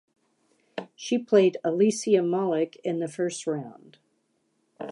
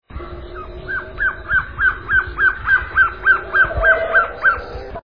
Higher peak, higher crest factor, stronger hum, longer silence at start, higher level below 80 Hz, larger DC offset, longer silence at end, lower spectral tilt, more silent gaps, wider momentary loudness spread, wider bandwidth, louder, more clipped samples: second, -8 dBFS vs -2 dBFS; about the same, 20 dB vs 16 dB; neither; first, 0.75 s vs 0.1 s; second, -82 dBFS vs -34 dBFS; second, under 0.1% vs 0.7%; about the same, 0 s vs 0.05 s; second, -5.5 dB/octave vs -7 dB/octave; neither; about the same, 19 LU vs 19 LU; first, 11.5 kHz vs 5.2 kHz; second, -25 LUFS vs -16 LUFS; neither